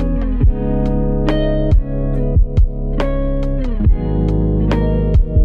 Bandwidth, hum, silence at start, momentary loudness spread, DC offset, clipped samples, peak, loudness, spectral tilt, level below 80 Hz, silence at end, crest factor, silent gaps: 5.2 kHz; none; 0 s; 4 LU; under 0.1%; under 0.1%; -2 dBFS; -17 LUFS; -9.5 dB/octave; -16 dBFS; 0 s; 12 dB; none